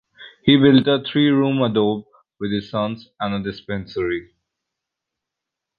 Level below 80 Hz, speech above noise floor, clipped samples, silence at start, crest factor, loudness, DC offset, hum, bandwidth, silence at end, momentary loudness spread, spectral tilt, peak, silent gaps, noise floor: -54 dBFS; 65 dB; under 0.1%; 0.2 s; 18 dB; -19 LUFS; under 0.1%; none; 5.2 kHz; 1.55 s; 14 LU; -9 dB/octave; -2 dBFS; none; -84 dBFS